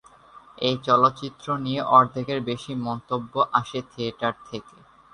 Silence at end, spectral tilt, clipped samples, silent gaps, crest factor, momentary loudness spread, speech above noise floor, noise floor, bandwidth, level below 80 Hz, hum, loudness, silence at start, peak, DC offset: 0.5 s; -6 dB/octave; under 0.1%; none; 20 dB; 15 LU; 26 dB; -50 dBFS; 10.5 kHz; -62 dBFS; none; -24 LUFS; 0.35 s; -4 dBFS; under 0.1%